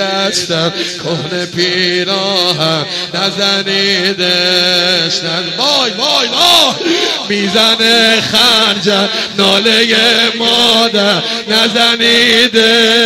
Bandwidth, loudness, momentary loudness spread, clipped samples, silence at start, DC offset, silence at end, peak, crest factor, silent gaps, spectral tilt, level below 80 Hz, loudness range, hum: 16.5 kHz; -9 LUFS; 7 LU; 0.2%; 0 s; under 0.1%; 0 s; 0 dBFS; 12 dB; none; -2.5 dB/octave; -52 dBFS; 4 LU; none